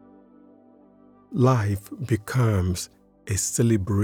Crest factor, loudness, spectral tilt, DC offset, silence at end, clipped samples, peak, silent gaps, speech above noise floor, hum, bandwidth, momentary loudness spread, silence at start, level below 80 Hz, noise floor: 18 dB; -24 LUFS; -6 dB/octave; under 0.1%; 0 s; under 0.1%; -6 dBFS; none; 31 dB; 50 Hz at -45 dBFS; 17 kHz; 11 LU; 1.3 s; -50 dBFS; -54 dBFS